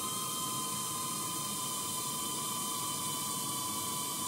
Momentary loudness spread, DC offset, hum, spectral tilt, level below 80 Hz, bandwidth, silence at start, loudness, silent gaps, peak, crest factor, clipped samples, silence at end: 1 LU; under 0.1%; none; -1.5 dB/octave; -74 dBFS; 16 kHz; 0 s; -34 LUFS; none; -24 dBFS; 12 dB; under 0.1%; 0 s